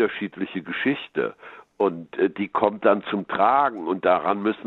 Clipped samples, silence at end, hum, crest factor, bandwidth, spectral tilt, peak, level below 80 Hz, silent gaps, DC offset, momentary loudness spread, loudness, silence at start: under 0.1%; 0.05 s; none; 20 dB; 4.2 kHz; -8.5 dB/octave; -4 dBFS; -66 dBFS; none; under 0.1%; 9 LU; -23 LUFS; 0 s